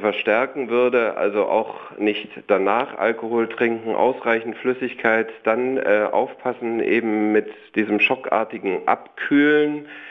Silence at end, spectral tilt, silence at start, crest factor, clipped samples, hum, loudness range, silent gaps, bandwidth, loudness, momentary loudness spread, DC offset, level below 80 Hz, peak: 0 s; -7.5 dB/octave; 0 s; 18 dB; under 0.1%; none; 1 LU; none; 6 kHz; -21 LUFS; 6 LU; under 0.1%; -70 dBFS; -4 dBFS